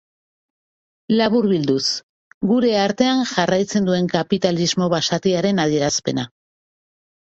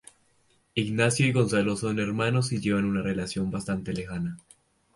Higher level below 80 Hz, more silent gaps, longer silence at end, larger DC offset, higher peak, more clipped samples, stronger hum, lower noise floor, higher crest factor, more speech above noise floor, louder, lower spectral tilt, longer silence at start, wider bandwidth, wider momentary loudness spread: about the same, -56 dBFS vs -54 dBFS; first, 2.03-2.41 s vs none; first, 1.1 s vs 0.55 s; neither; first, -2 dBFS vs -8 dBFS; neither; neither; first, under -90 dBFS vs -66 dBFS; about the same, 18 dB vs 20 dB; first, over 72 dB vs 40 dB; first, -19 LUFS vs -27 LUFS; about the same, -4.5 dB/octave vs -5.5 dB/octave; first, 1.1 s vs 0.75 s; second, 8.2 kHz vs 11.5 kHz; second, 5 LU vs 10 LU